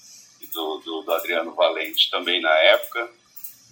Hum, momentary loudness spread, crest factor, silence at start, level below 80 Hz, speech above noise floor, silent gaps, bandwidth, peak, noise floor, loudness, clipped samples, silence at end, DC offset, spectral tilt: none; 20 LU; 20 dB; 0.1 s; -82 dBFS; 23 dB; none; over 20 kHz; -2 dBFS; -45 dBFS; -21 LUFS; under 0.1%; 0.2 s; under 0.1%; -0.5 dB/octave